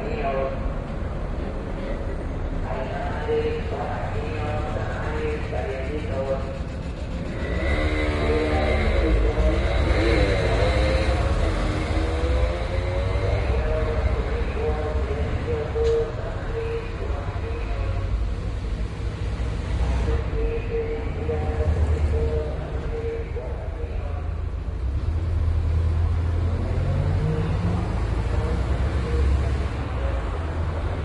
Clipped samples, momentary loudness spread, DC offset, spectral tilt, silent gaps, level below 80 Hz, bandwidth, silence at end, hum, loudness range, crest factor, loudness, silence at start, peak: under 0.1%; 8 LU; under 0.1%; -7.5 dB/octave; none; -26 dBFS; 10.5 kHz; 0 s; none; 6 LU; 16 dB; -26 LUFS; 0 s; -8 dBFS